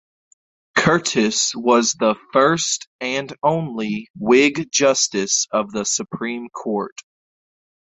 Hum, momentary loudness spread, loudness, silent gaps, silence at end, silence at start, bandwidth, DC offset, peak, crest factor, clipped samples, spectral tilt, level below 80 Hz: none; 10 LU; -19 LUFS; 2.87-2.99 s, 4.10-4.14 s; 1.05 s; 0.75 s; 8.4 kHz; under 0.1%; -2 dBFS; 18 dB; under 0.1%; -3 dB/octave; -60 dBFS